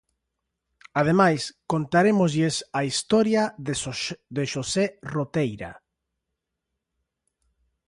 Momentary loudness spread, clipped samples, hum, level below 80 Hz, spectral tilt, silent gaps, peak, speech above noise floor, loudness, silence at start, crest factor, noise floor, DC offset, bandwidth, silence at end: 10 LU; under 0.1%; none; -58 dBFS; -5 dB/octave; none; -6 dBFS; 59 dB; -24 LUFS; 0.95 s; 20 dB; -83 dBFS; under 0.1%; 11.5 kHz; 2.15 s